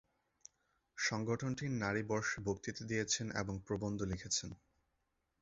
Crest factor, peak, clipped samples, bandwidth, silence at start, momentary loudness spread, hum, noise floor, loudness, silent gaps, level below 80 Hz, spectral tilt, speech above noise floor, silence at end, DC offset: 20 dB; -22 dBFS; under 0.1%; 7.6 kHz; 0.95 s; 5 LU; none; -83 dBFS; -39 LUFS; none; -62 dBFS; -4.5 dB/octave; 44 dB; 0.85 s; under 0.1%